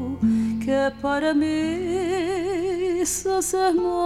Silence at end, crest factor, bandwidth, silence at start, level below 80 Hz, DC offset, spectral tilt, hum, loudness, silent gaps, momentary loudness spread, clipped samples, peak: 0 s; 12 dB; 16 kHz; 0 s; -48 dBFS; 0.1%; -4.5 dB/octave; none; -23 LUFS; none; 4 LU; under 0.1%; -10 dBFS